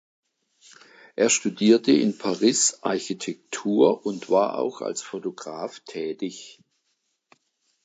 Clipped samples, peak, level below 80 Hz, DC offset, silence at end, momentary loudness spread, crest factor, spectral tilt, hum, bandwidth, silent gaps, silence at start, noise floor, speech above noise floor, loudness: under 0.1%; -4 dBFS; -78 dBFS; under 0.1%; 1.35 s; 15 LU; 20 dB; -3.5 dB/octave; none; 9.4 kHz; none; 1.2 s; -74 dBFS; 51 dB; -23 LUFS